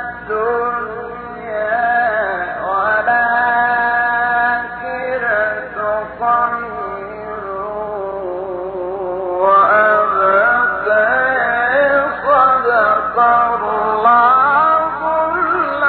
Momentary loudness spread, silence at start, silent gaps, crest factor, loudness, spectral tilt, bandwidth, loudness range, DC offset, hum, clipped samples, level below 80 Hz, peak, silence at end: 12 LU; 0 s; none; 14 dB; -15 LUFS; -8.5 dB/octave; 4.5 kHz; 7 LU; under 0.1%; 60 Hz at -45 dBFS; under 0.1%; -48 dBFS; -2 dBFS; 0 s